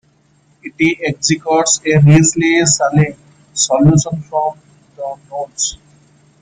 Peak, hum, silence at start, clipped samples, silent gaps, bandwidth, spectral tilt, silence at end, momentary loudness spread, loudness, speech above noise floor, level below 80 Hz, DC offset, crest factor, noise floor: 0 dBFS; none; 0.65 s; under 0.1%; none; 9.6 kHz; -4.5 dB/octave; 0.65 s; 16 LU; -13 LUFS; 41 dB; -44 dBFS; under 0.1%; 14 dB; -54 dBFS